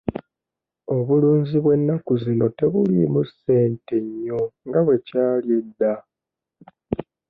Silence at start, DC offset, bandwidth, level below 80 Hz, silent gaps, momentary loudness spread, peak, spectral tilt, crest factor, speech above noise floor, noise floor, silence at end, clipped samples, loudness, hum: 0.05 s; under 0.1%; 4.8 kHz; -54 dBFS; none; 12 LU; -6 dBFS; -12 dB/octave; 14 dB; 67 dB; -87 dBFS; 0.3 s; under 0.1%; -21 LUFS; none